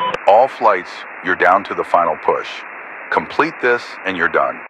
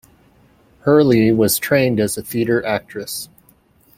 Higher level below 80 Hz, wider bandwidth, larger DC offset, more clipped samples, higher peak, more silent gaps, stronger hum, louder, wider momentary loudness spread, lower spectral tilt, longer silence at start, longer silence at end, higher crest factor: second, -60 dBFS vs -52 dBFS; second, 10.5 kHz vs 16.5 kHz; neither; neither; about the same, 0 dBFS vs -2 dBFS; neither; neither; about the same, -16 LUFS vs -17 LUFS; about the same, 15 LU vs 14 LU; about the same, -5 dB/octave vs -5 dB/octave; second, 0 s vs 0.85 s; second, 0 s vs 0.7 s; about the same, 16 dB vs 16 dB